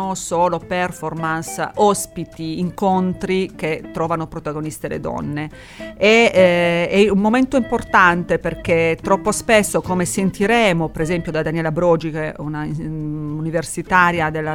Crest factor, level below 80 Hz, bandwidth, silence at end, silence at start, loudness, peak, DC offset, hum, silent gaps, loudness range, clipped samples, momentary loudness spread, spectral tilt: 18 dB; -42 dBFS; 17.5 kHz; 0 s; 0 s; -18 LUFS; 0 dBFS; under 0.1%; none; none; 7 LU; under 0.1%; 12 LU; -5 dB/octave